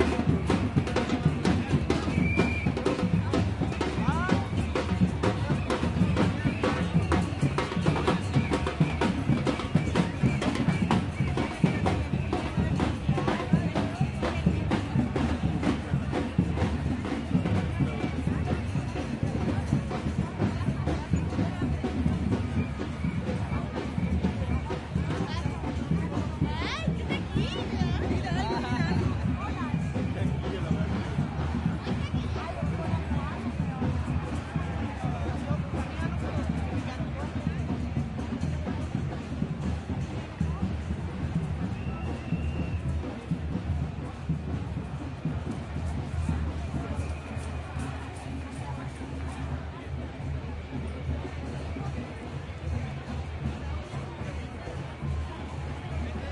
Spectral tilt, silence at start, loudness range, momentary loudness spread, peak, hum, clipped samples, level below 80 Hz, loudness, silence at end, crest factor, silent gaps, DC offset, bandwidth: -7 dB/octave; 0 s; 8 LU; 9 LU; -10 dBFS; none; under 0.1%; -40 dBFS; -30 LUFS; 0 s; 20 dB; none; under 0.1%; 11.5 kHz